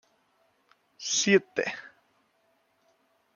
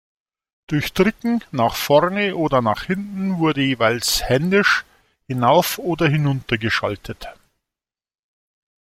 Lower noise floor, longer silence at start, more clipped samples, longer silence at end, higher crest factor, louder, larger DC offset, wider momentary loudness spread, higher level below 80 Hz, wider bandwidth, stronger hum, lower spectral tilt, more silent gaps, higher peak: second, -70 dBFS vs -89 dBFS; first, 1 s vs 0.7 s; neither; about the same, 1.45 s vs 1.55 s; about the same, 22 dB vs 18 dB; second, -26 LUFS vs -19 LUFS; neither; first, 16 LU vs 9 LU; second, -80 dBFS vs -46 dBFS; second, 7.4 kHz vs 16.5 kHz; neither; second, -2.5 dB/octave vs -5 dB/octave; neither; second, -10 dBFS vs -2 dBFS